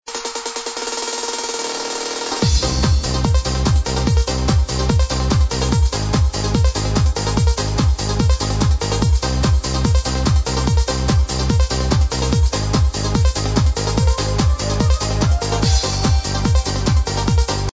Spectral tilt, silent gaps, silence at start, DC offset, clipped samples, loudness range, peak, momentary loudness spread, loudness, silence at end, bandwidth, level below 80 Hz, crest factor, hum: -5 dB/octave; none; 0.05 s; under 0.1%; under 0.1%; 1 LU; -4 dBFS; 4 LU; -18 LUFS; 0.05 s; 8 kHz; -20 dBFS; 12 dB; none